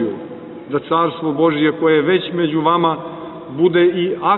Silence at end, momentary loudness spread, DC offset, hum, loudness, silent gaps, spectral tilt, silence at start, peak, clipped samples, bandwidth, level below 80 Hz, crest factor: 0 s; 16 LU; under 0.1%; none; -16 LUFS; none; -10.5 dB/octave; 0 s; -2 dBFS; under 0.1%; 4.1 kHz; -60 dBFS; 14 dB